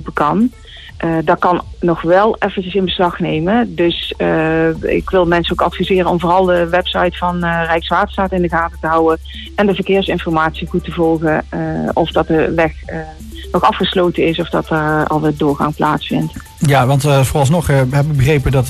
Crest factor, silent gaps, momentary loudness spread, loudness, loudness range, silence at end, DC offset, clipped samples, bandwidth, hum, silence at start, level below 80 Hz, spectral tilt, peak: 12 dB; none; 6 LU; -15 LUFS; 2 LU; 0 s; under 0.1%; under 0.1%; 14 kHz; none; 0 s; -32 dBFS; -6.5 dB/octave; -2 dBFS